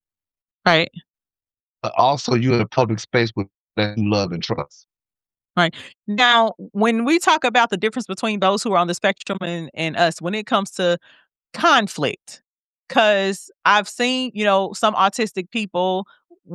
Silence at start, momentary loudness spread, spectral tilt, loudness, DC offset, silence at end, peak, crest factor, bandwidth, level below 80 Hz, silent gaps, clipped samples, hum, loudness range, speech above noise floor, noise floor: 0.65 s; 10 LU; -4.5 dB/octave; -19 LUFS; under 0.1%; 0 s; 0 dBFS; 20 dB; 12.5 kHz; -62 dBFS; 1.10-1.14 s, 1.61-1.73 s, 3.57-3.68 s, 12.47-12.75 s; under 0.1%; none; 3 LU; over 71 dB; under -90 dBFS